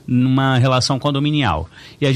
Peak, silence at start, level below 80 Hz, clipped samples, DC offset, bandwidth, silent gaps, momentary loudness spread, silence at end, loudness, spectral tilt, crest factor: -4 dBFS; 0.1 s; -42 dBFS; under 0.1%; under 0.1%; 10.5 kHz; none; 8 LU; 0 s; -17 LUFS; -6 dB/octave; 12 dB